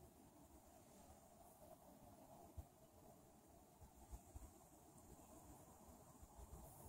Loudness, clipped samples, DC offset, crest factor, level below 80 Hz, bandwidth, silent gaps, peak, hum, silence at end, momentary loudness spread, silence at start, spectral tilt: -65 LUFS; under 0.1%; under 0.1%; 20 dB; -68 dBFS; 16 kHz; none; -44 dBFS; none; 0 s; 6 LU; 0 s; -5 dB/octave